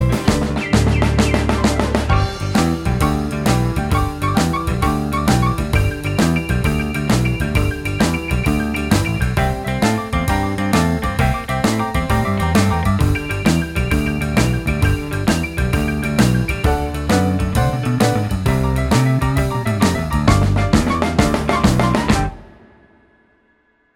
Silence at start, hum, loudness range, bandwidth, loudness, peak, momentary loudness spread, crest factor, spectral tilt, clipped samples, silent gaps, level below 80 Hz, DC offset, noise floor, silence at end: 0 s; none; 2 LU; 18 kHz; -17 LUFS; 0 dBFS; 3 LU; 16 dB; -6 dB/octave; under 0.1%; none; -24 dBFS; under 0.1%; -59 dBFS; 1.5 s